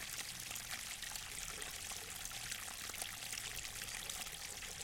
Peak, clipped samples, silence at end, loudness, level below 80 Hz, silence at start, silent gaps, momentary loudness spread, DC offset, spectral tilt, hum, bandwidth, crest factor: -24 dBFS; under 0.1%; 0 s; -44 LUFS; -62 dBFS; 0 s; none; 2 LU; under 0.1%; 0 dB/octave; none; 17 kHz; 24 dB